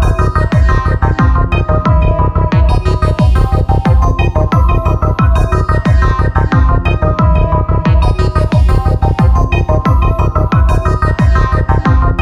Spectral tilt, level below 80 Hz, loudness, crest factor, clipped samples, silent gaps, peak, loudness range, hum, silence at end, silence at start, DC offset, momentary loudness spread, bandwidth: -8 dB/octave; -12 dBFS; -12 LUFS; 10 dB; under 0.1%; none; 0 dBFS; 0 LU; none; 0 s; 0 s; 0.6%; 2 LU; 9 kHz